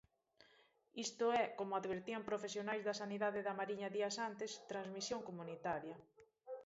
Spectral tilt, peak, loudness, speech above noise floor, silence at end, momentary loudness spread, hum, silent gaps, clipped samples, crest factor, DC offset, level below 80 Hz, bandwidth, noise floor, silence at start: -3 dB/octave; -26 dBFS; -43 LUFS; 30 dB; 0 s; 9 LU; none; none; under 0.1%; 18 dB; under 0.1%; -82 dBFS; 7.6 kHz; -73 dBFS; 0.95 s